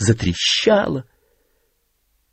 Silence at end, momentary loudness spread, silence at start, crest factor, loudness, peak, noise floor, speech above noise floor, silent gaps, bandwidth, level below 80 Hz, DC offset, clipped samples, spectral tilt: 1.3 s; 10 LU; 0 s; 18 dB; -18 LUFS; -2 dBFS; -66 dBFS; 49 dB; none; 8.8 kHz; -44 dBFS; under 0.1%; under 0.1%; -4.5 dB/octave